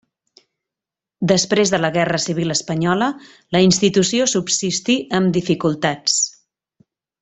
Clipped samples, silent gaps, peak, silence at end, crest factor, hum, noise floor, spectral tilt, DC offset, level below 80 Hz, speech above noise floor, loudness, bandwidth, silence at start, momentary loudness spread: under 0.1%; none; -2 dBFS; 0.9 s; 18 dB; none; -87 dBFS; -4 dB/octave; under 0.1%; -56 dBFS; 70 dB; -18 LUFS; 8.4 kHz; 1.2 s; 5 LU